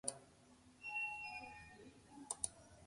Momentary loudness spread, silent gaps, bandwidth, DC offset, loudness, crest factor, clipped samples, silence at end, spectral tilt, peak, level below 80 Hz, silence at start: 21 LU; none; 11.5 kHz; under 0.1%; -46 LUFS; 30 dB; under 0.1%; 0 s; -1 dB/octave; -20 dBFS; -74 dBFS; 0.05 s